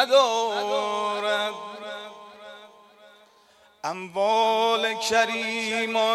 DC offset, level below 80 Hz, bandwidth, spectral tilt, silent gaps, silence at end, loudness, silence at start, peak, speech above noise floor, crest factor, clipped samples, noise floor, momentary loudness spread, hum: under 0.1%; -76 dBFS; 14.5 kHz; -2 dB/octave; none; 0 s; -24 LUFS; 0 s; -6 dBFS; 35 dB; 20 dB; under 0.1%; -57 dBFS; 18 LU; none